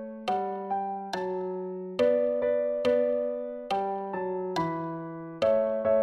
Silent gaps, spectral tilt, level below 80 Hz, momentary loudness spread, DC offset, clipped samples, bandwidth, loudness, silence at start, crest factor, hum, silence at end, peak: none; -6.5 dB/octave; -66 dBFS; 9 LU; under 0.1%; under 0.1%; 10.5 kHz; -29 LUFS; 0 s; 14 dB; none; 0 s; -14 dBFS